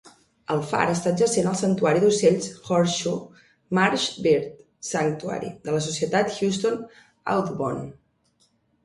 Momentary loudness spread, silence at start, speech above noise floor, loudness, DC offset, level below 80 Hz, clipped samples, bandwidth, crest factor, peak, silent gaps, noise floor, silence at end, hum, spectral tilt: 12 LU; 0.5 s; 43 dB; -24 LUFS; under 0.1%; -62 dBFS; under 0.1%; 11.5 kHz; 20 dB; -4 dBFS; none; -66 dBFS; 0.9 s; none; -4.5 dB/octave